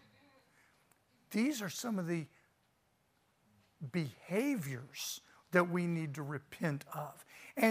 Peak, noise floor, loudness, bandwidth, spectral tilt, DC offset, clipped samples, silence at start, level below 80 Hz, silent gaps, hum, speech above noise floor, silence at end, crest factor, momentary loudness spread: -14 dBFS; -76 dBFS; -38 LUFS; 15.5 kHz; -5.5 dB/octave; under 0.1%; under 0.1%; 1.3 s; -82 dBFS; none; none; 39 dB; 0 s; 24 dB; 13 LU